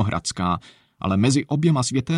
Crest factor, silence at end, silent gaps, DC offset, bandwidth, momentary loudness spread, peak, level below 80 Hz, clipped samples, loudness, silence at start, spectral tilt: 14 dB; 0 s; none; under 0.1%; 11.5 kHz; 7 LU; -6 dBFS; -48 dBFS; under 0.1%; -22 LUFS; 0 s; -5.5 dB/octave